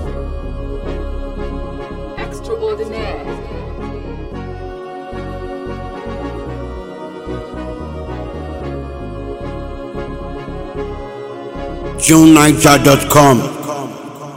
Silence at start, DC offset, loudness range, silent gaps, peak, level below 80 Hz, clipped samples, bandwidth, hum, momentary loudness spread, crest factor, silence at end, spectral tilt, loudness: 0 s; under 0.1%; 16 LU; none; 0 dBFS; -30 dBFS; 0.4%; over 20 kHz; none; 19 LU; 16 dB; 0 s; -5 dB/octave; -16 LUFS